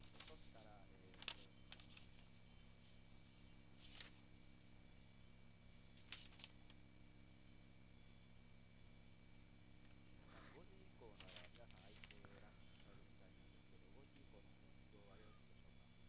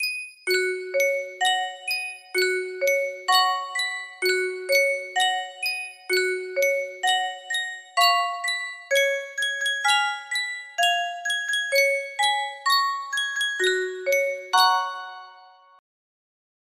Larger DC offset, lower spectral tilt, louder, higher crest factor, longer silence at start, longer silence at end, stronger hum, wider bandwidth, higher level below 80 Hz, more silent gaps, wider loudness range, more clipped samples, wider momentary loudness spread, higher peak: neither; first, -3.5 dB/octave vs 1 dB/octave; second, -64 LUFS vs -23 LUFS; first, 32 dB vs 18 dB; about the same, 0 s vs 0 s; second, 0 s vs 1.3 s; first, 60 Hz at -80 dBFS vs none; second, 4 kHz vs 16 kHz; first, -72 dBFS vs -78 dBFS; neither; first, 6 LU vs 2 LU; neither; about the same, 8 LU vs 7 LU; second, -32 dBFS vs -6 dBFS